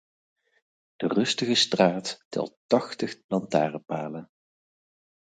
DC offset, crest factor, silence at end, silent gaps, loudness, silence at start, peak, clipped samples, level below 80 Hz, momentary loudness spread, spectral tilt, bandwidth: under 0.1%; 22 dB; 1.05 s; 2.25-2.31 s, 2.57-2.69 s, 3.24-3.29 s; -26 LUFS; 1 s; -6 dBFS; under 0.1%; -72 dBFS; 11 LU; -4 dB/octave; 9.4 kHz